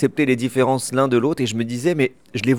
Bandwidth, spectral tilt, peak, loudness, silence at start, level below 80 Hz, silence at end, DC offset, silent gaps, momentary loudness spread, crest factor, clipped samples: 17.5 kHz; -5.5 dB/octave; -6 dBFS; -20 LUFS; 0 s; -64 dBFS; 0 s; 0.3%; none; 4 LU; 14 dB; under 0.1%